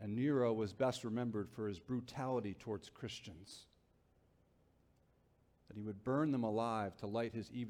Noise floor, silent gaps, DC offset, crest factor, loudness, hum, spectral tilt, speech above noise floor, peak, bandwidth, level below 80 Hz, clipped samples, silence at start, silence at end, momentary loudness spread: -73 dBFS; none; under 0.1%; 18 dB; -40 LUFS; none; -7 dB/octave; 33 dB; -24 dBFS; 15 kHz; -72 dBFS; under 0.1%; 0 s; 0 s; 14 LU